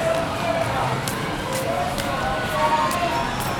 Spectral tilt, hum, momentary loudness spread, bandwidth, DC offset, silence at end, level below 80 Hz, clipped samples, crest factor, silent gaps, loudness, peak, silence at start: -4.5 dB/octave; none; 5 LU; over 20 kHz; under 0.1%; 0 s; -40 dBFS; under 0.1%; 18 dB; none; -23 LUFS; -6 dBFS; 0 s